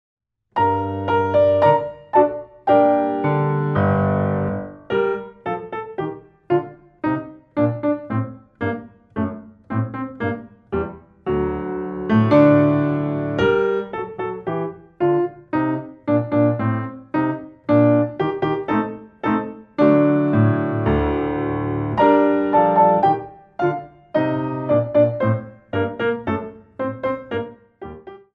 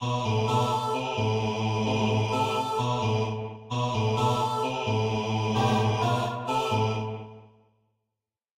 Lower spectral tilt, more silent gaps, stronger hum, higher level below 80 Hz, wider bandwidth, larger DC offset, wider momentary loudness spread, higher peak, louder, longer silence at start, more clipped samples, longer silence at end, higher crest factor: first, -10 dB/octave vs -6 dB/octave; neither; neither; first, -44 dBFS vs -56 dBFS; second, 5.2 kHz vs 13.5 kHz; neither; first, 13 LU vs 5 LU; first, -2 dBFS vs -12 dBFS; first, -20 LUFS vs -27 LUFS; first, 0.55 s vs 0 s; neither; second, 0.15 s vs 1.1 s; about the same, 18 dB vs 16 dB